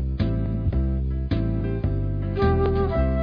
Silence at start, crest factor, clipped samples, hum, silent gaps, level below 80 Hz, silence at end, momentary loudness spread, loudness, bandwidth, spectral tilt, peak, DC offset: 0 s; 14 dB; under 0.1%; none; none; -26 dBFS; 0 s; 5 LU; -24 LUFS; 5.2 kHz; -11 dB/octave; -8 dBFS; under 0.1%